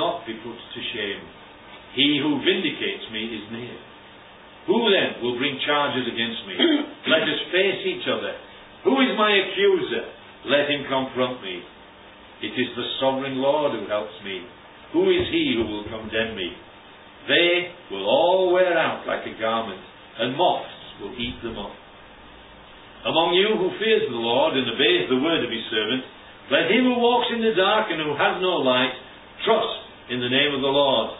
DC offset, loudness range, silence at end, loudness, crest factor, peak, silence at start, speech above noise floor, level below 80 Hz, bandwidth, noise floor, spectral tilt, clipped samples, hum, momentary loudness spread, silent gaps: under 0.1%; 5 LU; 0 s; -22 LUFS; 18 dB; -4 dBFS; 0 s; 24 dB; -56 dBFS; 4 kHz; -46 dBFS; -9 dB/octave; under 0.1%; none; 16 LU; none